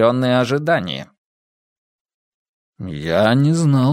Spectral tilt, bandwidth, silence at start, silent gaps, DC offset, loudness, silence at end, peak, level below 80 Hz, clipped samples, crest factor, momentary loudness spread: -6.5 dB/octave; 12 kHz; 0 s; 1.18-2.05 s, 2.14-2.73 s; under 0.1%; -17 LUFS; 0 s; 0 dBFS; -52 dBFS; under 0.1%; 18 dB; 15 LU